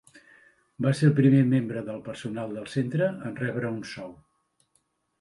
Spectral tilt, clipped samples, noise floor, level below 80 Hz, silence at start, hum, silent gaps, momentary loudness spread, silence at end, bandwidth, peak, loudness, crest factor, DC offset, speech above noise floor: -8 dB/octave; under 0.1%; -72 dBFS; -66 dBFS; 0.15 s; none; none; 16 LU; 1.05 s; 11.5 kHz; -8 dBFS; -26 LUFS; 20 dB; under 0.1%; 46 dB